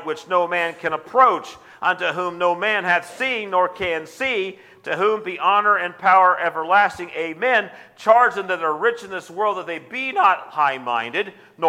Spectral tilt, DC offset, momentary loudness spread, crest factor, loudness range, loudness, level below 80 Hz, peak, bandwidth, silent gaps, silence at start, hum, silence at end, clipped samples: -4 dB/octave; under 0.1%; 12 LU; 18 dB; 4 LU; -20 LUFS; -64 dBFS; -2 dBFS; 15.5 kHz; none; 0 s; none; 0 s; under 0.1%